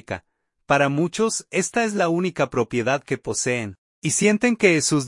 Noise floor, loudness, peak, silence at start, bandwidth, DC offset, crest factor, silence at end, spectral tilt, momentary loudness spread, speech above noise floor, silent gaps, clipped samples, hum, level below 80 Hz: -65 dBFS; -21 LUFS; -4 dBFS; 0.1 s; 11.5 kHz; under 0.1%; 18 dB; 0 s; -4 dB/octave; 9 LU; 44 dB; 3.78-4.02 s; under 0.1%; none; -58 dBFS